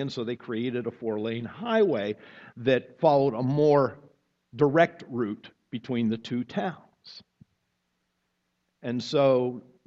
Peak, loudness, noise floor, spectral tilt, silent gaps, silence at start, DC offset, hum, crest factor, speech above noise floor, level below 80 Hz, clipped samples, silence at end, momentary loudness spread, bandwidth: -6 dBFS; -27 LUFS; -77 dBFS; -7.5 dB/octave; none; 0 s; under 0.1%; none; 22 dB; 51 dB; -68 dBFS; under 0.1%; 0.25 s; 18 LU; 7.6 kHz